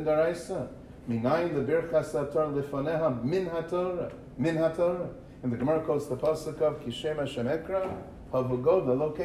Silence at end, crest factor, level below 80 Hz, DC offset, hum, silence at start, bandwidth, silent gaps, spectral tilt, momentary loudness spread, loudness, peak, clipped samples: 0 s; 16 dB; -54 dBFS; under 0.1%; none; 0 s; 13.5 kHz; none; -7 dB/octave; 9 LU; -29 LUFS; -12 dBFS; under 0.1%